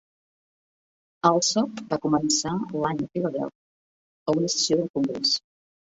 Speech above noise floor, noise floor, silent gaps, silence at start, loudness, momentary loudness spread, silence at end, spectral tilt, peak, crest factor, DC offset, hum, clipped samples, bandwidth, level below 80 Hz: over 66 dB; under -90 dBFS; 3.55-4.26 s, 4.90-4.94 s; 1.25 s; -24 LUFS; 7 LU; 0.5 s; -4 dB/octave; -4 dBFS; 24 dB; under 0.1%; none; under 0.1%; 8 kHz; -64 dBFS